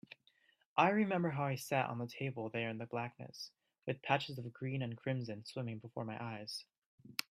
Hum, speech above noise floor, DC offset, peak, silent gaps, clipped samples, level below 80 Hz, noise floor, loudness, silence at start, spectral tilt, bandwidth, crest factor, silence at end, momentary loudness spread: none; 35 dB; under 0.1%; -14 dBFS; 6.78-6.98 s; under 0.1%; -80 dBFS; -73 dBFS; -39 LUFS; 0.75 s; -5.5 dB/octave; 15.5 kHz; 26 dB; 0.1 s; 15 LU